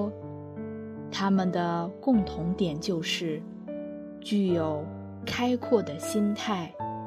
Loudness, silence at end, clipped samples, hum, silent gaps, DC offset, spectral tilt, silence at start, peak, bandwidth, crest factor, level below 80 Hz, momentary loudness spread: -29 LUFS; 0 s; under 0.1%; none; none; under 0.1%; -6 dB/octave; 0 s; -10 dBFS; 13.5 kHz; 18 dB; -56 dBFS; 13 LU